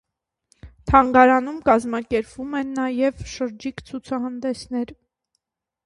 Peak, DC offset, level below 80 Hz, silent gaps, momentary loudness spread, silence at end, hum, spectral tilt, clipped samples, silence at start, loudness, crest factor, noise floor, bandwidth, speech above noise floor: 0 dBFS; under 0.1%; -44 dBFS; none; 16 LU; 0.95 s; none; -6 dB/octave; under 0.1%; 0.65 s; -21 LUFS; 22 dB; -76 dBFS; 11 kHz; 56 dB